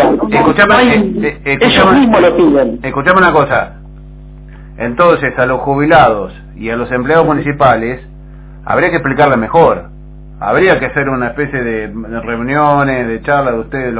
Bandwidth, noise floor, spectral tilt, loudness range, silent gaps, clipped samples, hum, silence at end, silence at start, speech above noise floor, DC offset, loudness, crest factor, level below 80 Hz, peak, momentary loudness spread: 4 kHz; -31 dBFS; -10 dB/octave; 5 LU; none; 0.5%; none; 0 s; 0 s; 21 dB; under 0.1%; -11 LUFS; 12 dB; -32 dBFS; 0 dBFS; 13 LU